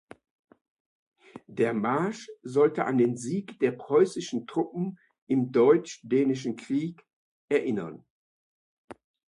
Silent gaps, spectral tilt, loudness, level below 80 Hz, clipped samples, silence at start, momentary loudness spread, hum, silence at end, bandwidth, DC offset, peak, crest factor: 5.18-5.27 s, 7.13-7.48 s, 8.10-8.88 s; -6.5 dB/octave; -27 LUFS; -74 dBFS; under 0.1%; 1.35 s; 11 LU; none; 0.35 s; 11 kHz; under 0.1%; -8 dBFS; 20 dB